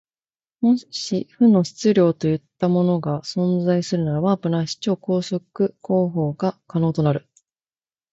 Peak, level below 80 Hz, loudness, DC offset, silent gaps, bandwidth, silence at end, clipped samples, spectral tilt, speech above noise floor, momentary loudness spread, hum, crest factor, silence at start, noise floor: -6 dBFS; -58 dBFS; -21 LUFS; under 0.1%; none; 8 kHz; 0.95 s; under 0.1%; -7 dB/octave; over 70 dB; 7 LU; none; 16 dB; 0.6 s; under -90 dBFS